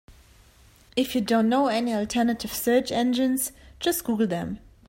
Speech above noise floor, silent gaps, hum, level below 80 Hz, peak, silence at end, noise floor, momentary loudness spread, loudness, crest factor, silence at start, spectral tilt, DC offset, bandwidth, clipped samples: 31 dB; none; none; -54 dBFS; -10 dBFS; 0.3 s; -55 dBFS; 8 LU; -25 LUFS; 16 dB; 0.1 s; -4 dB/octave; under 0.1%; 16.5 kHz; under 0.1%